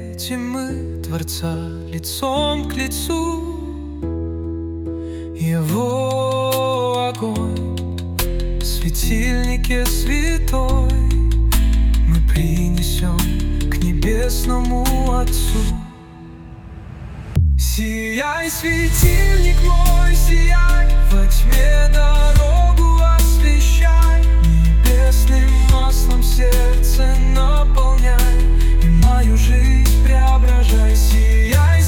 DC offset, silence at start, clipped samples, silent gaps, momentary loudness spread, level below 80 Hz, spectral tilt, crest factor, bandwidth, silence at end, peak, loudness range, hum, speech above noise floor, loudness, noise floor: under 0.1%; 0 s; under 0.1%; none; 11 LU; -14 dBFS; -5.5 dB/octave; 12 dB; 18 kHz; 0 s; 0 dBFS; 8 LU; none; 23 dB; -17 LUFS; -37 dBFS